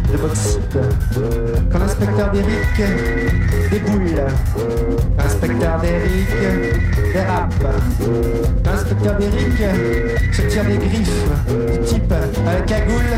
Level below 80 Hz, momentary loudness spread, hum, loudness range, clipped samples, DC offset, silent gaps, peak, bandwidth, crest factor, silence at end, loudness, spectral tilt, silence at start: -20 dBFS; 2 LU; none; 0 LU; under 0.1%; under 0.1%; none; -4 dBFS; 16 kHz; 12 dB; 0 s; -18 LUFS; -6.5 dB/octave; 0 s